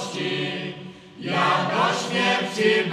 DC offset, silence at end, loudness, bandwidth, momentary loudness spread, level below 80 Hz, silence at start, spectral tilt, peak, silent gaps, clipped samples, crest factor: under 0.1%; 0 s; -22 LUFS; 13.5 kHz; 14 LU; -68 dBFS; 0 s; -4 dB/octave; -6 dBFS; none; under 0.1%; 16 dB